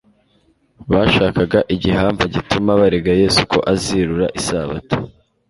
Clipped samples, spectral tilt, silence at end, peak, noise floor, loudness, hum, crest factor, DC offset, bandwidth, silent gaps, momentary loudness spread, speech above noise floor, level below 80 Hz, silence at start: under 0.1%; -5.5 dB/octave; 0.4 s; 0 dBFS; -58 dBFS; -16 LUFS; none; 16 dB; under 0.1%; 11.5 kHz; none; 9 LU; 42 dB; -36 dBFS; 0.8 s